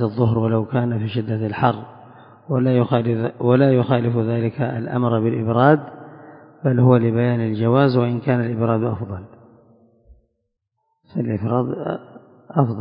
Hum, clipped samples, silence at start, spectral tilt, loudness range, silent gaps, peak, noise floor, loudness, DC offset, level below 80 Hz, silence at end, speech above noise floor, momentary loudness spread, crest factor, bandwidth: none; under 0.1%; 0 s; -13 dB/octave; 8 LU; none; 0 dBFS; -74 dBFS; -19 LUFS; under 0.1%; -52 dBFS; 0 s; 56 dB; 12 LU; 20 dB; 5.2 kHz